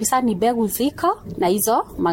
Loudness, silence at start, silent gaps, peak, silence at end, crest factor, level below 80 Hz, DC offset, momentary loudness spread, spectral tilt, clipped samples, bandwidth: -20 LUFS; 0 s; none; -6 dBFS; 0 s; 12 dB; -48 dBFS; under 0.1%; 4 LU; -4 dB/octave; under 0.1%; 17 kHz